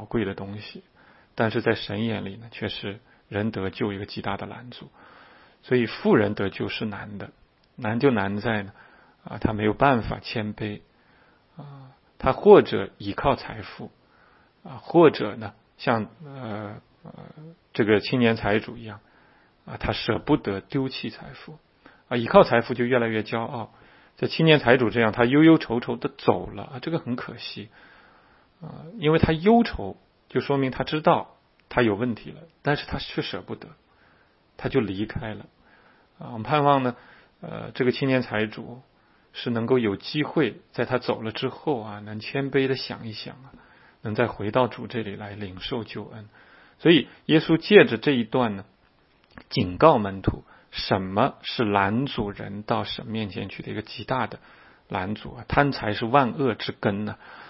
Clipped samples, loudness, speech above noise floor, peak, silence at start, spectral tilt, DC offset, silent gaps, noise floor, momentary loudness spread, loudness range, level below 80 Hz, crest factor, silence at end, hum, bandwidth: under 0.1%; -24 LUFS; 37 dB; 0 dBFS; 0 s; -10 dB/octave; under 0.1%; none; -61 dBFS; 21 LU; 8 LU; -50 dBFS; 26 dB; 0 s; none; 5.8 kHz